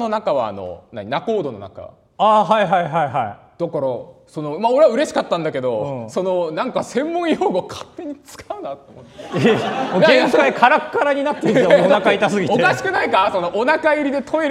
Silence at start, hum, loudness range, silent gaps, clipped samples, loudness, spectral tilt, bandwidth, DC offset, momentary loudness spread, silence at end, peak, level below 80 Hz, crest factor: 0 s; none; 7 LU; none; under 0.1%; -17 LUFS; -5.5 dB/octave; 13 kHz; under 0.1%; 18 LU; 0 s; 0 dBFS; -60 dBFS; 18 dB